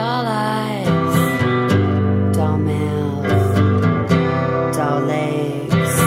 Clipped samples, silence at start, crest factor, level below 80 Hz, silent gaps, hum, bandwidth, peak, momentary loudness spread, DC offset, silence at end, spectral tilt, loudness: under 0.1%; 0 s; 14 dB; -46 dBFS; none; none; 16 kHz; -2 dBFS; 4 LU; under 0.1%; 0 s; -6.5 dB/octave; -18 LUFS